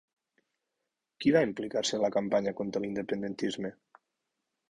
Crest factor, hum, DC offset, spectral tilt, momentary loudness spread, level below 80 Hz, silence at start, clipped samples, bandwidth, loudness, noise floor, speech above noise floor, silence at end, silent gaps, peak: 20 dB; none; under 0.1%; -5 dB/octave; 8 LU; -68 dBFS; 1.2 s; under 0.1%; 11 kHz; -31 LUFS; -86 dBFS; 56 dB; 1 s; none; -12 dBFS